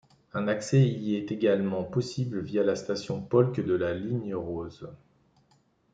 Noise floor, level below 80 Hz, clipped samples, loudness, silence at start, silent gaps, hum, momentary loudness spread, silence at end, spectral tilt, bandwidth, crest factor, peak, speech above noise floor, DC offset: -67 dBFS; -64 dBFS; under 0.1%; -28 LUFS; 0.35 s; none; none; 12 LU; 1 s; -7 dB/octave; 9.2 kHz; 20 dB; -8 dBFS; 39 dB; under 0.1%